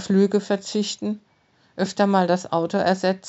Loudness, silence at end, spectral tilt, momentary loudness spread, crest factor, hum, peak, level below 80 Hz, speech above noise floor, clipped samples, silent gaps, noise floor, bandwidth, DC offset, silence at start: -22 LUFS; 0 s; -5.5 dB/octave; 10 LU; 18 dB; none; -4 dBFS; -70 dBFS; 36 dB; under 0.1%; none; -57 dBFS; 8.2 kHz; under 0.1%; 0 s